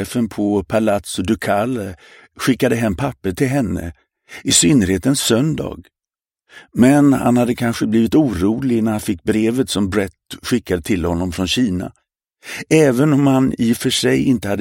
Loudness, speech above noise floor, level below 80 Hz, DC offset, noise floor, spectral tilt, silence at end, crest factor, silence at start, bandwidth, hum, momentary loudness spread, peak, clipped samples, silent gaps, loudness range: -17 LUFS; 73 dB; -42 dBFS; under 0.1%; -90 dBFS; -5 dB/octave; 0 s; 16 dB; 0 s; 17 kHz; none; 12 LU; 0 dBFS; under 0.1%; none; 4 LU